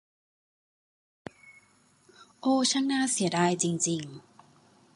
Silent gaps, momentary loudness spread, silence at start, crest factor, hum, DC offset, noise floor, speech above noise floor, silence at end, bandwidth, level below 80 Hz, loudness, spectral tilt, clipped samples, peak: none; 23 LU; 1.45 s; 20 dB; none; under 0.1%; -64 dBFS; 37 dB; 0.75 s; 11.5 kHz; -76 dBFS; -27 LUFS; -3.5 dB/octave; under 0.1%; -10 dBFS